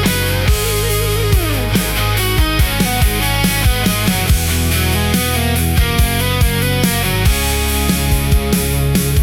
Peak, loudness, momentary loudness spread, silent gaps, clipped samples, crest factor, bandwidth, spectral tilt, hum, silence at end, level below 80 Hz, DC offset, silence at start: -2 dBFS; -15 LUFS; 1 LU; none; under 0.1%; 12 dB; 18 kHz; -4 dB/octave; none; 0 s; -20 dBFS; under 0.1%; 0 s